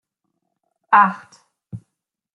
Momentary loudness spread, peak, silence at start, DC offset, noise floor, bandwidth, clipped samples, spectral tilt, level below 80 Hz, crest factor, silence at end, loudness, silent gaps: 24 LU; -2 dBFS; 0.9 s; under 0.1%; -79 dBFS; 8 kHz; under 0.1%; -6 dB/octave; -68 dBFS; 20 dB; 0.55 s; -16 LUFS; none